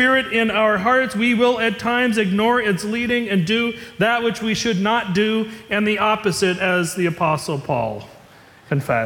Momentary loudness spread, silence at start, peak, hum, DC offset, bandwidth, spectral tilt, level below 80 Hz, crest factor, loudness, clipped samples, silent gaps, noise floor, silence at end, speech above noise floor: 6 LU; 0 s; -6 dBFS; none; under 0.1%; 18 kHz; -5 dB/octave; -54 dBFS; 14 dB; -19 LUFS; under 0.1%; none; -47 dBFS; 0 s; 28 dB